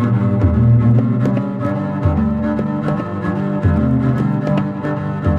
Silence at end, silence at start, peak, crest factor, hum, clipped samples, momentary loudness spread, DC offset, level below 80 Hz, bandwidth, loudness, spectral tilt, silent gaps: 0 s; 0 s; -4 dBFS; 12 dB; none; under 0.1%; 8 LU; under 0.1%; -30 dBFS; 4.8 kHz; -17 LUFS; -10.5 dB/octave; none